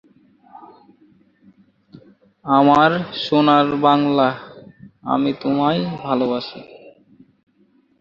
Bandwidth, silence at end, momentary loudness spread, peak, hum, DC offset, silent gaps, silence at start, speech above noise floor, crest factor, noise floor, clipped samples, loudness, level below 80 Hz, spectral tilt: 7.2 kHz; 1.1 s; 18 LU; -2 dBFS; none; under 0.1%; none; 0.6 s; 42 dB; 18 dB; -58 dBFS; under 0.1%; -17 LUFS; -60 dBFS; -7.5 dB/octave